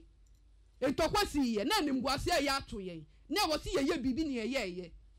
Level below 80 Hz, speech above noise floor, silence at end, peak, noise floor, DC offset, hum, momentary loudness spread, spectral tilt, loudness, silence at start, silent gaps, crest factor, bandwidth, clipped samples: -52 dBFS; 29 dB; 0.2 s; -22 dBFS; -62 dBFS; under 0.1%; none; 12 LU; -4 dB/octave; -33 LUFS; 0.8 s; none; 12 dB; 16 kHz; under 0.1%